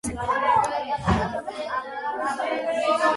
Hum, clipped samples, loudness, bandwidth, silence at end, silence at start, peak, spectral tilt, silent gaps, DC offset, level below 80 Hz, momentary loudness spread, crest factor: none; under 0.1%; -25 LUFS; 11.5 kHz; 0 s; 0.05 s; -8 dBFS; -5 dB/octave; none; under 0.1%; -42 dBFS; 8 LU; 16 dB